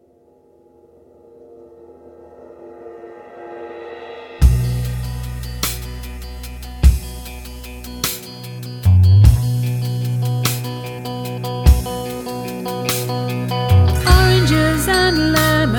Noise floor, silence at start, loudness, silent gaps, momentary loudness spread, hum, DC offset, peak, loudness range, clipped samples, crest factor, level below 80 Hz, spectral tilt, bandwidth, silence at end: -52 dBFS; 1.5 s; -17 LUFS; none; 20 LU; none; under 0.1%; 0 dBFS; 8 LU; under 0.1%; 18 dB; -22 dBFS; -5.5 dB/octave; 17.5 kHz; 0 s